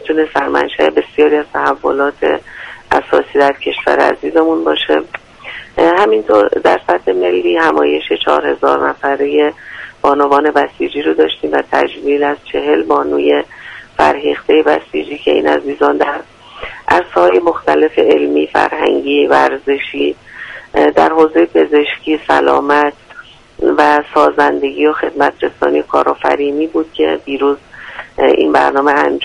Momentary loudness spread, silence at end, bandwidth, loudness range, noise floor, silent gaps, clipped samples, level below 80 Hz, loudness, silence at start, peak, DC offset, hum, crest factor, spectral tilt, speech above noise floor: 7 LU; 0 s; 10 kHz; 2 LU; -37 dBFS; none; under 0.1%; -46 dBFS; -12 LUFS; 0 s; 0 dBFS; under 0.1%; none; 12 dB; -5 dB/octave; 25 dB